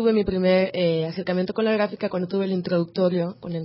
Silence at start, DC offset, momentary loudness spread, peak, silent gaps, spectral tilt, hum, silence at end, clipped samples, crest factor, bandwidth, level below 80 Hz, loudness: 0 s; under 0.1%; 5 LU; -8 dBFS; none; -11.5 dB/octave; none; 0 s; under 0.1%; 14 dB; 5.8 kHz; -50 dBFS; -23 LUFS